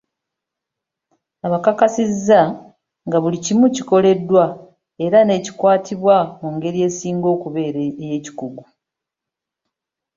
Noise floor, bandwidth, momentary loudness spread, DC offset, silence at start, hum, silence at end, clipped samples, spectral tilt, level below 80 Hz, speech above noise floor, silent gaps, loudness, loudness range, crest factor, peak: -85 dBFS; 7.6 kHz; 12 LU; under 0.1%; 1.45 s; none; 1.55 s; under 0.1%; -6 dB/octave; -60 dBFS; 68 dB; none; -17 LUFS; 7 LU; 16 dB; -2 dBFS